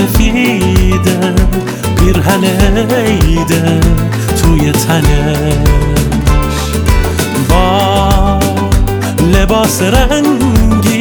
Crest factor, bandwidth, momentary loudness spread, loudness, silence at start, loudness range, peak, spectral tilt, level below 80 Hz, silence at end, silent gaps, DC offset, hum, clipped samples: 8 dB; over 20 kHz; 3 LU; -10 LUFS; 0 s; 1 LU; 0 dBFS; -5.5 dB/octave; -14 dBFS; 0 s; none; under 0.1%; none; under 0.1%